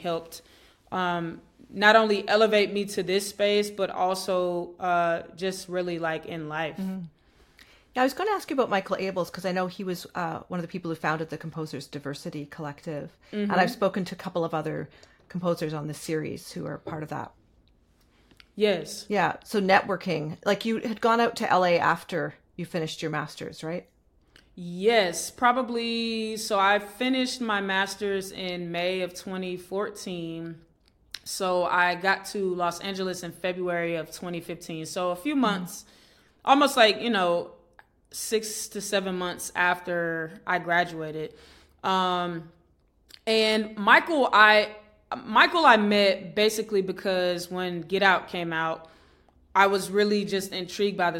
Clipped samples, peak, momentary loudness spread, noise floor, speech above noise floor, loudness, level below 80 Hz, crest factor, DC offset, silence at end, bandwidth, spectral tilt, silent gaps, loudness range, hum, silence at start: under 0.1%; -4 dBFS; 15 LU; -64 dBFS; 38 dB; -26 LUFS; -64 dBFS; 24 dB; under 0.1%; 0 s; 17 kHz; -4 dB/octave; none; 9 LU; none; 0 s